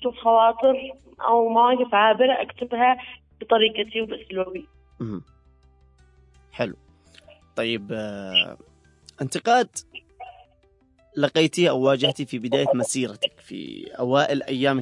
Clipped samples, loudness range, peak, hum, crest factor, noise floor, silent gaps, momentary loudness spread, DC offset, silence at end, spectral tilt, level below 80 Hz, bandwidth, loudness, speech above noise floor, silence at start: under 0.1%; 12 LU; -6 dBFS; none; 18 dB; -60 dBFS; none; 18 LU; under 0.1%; 0 s; -4 dB/octave; -60 dBFS; 11.5 kHz; -22 LUFS; 38 dB; 0 s